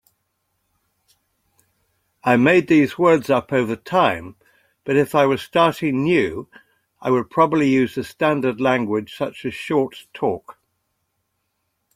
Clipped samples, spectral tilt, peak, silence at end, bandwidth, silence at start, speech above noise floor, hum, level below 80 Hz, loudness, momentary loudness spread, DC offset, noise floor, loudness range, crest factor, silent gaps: under 0.1%; -6.5 dB/octave; -2 dBFS; 1.45 s; 16 kHz; 2.25 s; 55 dB; none; -58 dBFS; -19 LUFS; 11 LU; under 0.1%; -73 dBFS; 5 LU; 18 dB; none